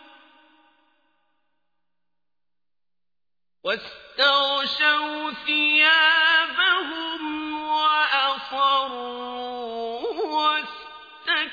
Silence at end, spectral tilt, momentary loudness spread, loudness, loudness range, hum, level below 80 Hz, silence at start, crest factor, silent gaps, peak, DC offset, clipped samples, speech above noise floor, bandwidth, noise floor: 0 s; -2 dB/octave; 16 LU; -21 LUFS; 8 LU; 60 Hz at -85 dBFS; -68 dBFS; 3.65 s; 18 dB; none; -6 dBFS; under 0.1%; under 0.1%; over 69 dB; 5 kHz; under -90 dBFS